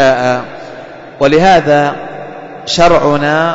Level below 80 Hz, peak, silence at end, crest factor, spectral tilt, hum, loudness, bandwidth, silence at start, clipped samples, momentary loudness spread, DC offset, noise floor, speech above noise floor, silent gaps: -36 dBFS; 0 dBFS; 0 s; 10 dB; -5 dB/octave; none; -10 LUFS; 8 kHz; 0 s; under 0.1%; 20 LU; under 0.1%; -29 dBFS; 20 dB; none